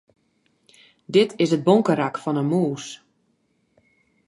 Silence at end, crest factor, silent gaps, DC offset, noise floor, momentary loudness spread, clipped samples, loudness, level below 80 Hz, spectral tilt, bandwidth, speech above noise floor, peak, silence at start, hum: 1.35 s; 22 dB; none; under 0.1%; -68 dBFS; 15 LU; under 0.1%; -21 LUFS; -72 dBFS; -6.5 dB/octave; 11.5 kHz; 47 dB; -2 dBFS; 1.1 s; none